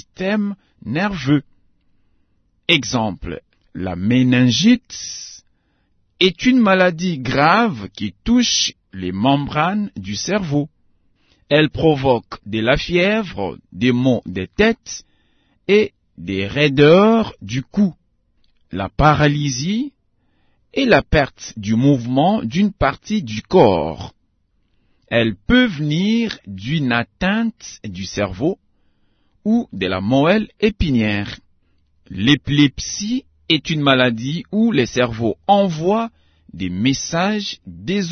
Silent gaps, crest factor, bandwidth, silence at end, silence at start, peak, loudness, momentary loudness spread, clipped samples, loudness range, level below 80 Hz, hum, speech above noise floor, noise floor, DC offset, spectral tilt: none; 18 dB; 6.6 kHz; 0 s; 0.2 s; 0 dBFS; -17 LUFS; 14 LU; under 0.1%; 4 LU; -40 dBFS; none; 46 dB; -63 dBFS; under 0.1%; -5 dB/octave